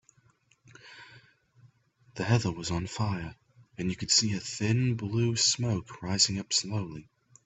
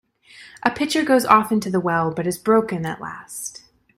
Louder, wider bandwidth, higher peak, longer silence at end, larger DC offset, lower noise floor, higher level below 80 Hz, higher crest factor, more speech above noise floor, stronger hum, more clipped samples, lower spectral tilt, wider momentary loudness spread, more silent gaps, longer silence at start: second, -28 LUFS vs -20 LUFS; second, 8.4 kHz vs 16 kHz; second, -8 dBFS vs 0 dBFS; about the same, 0.45 s vs 0.4 s; neither; first, -66 dBFS vs -47 dBFS; about the same, -60 dBFS vs -58 dBFS; about the same, 24 dB vs 20 dB; first, 37 dB vs 27 dB; neither; neither; second, -3.5 dB/octave vs -5 dB/octave; first, 22 LU vs 16 LU; neither; first, 0.85 s vs 0.4 s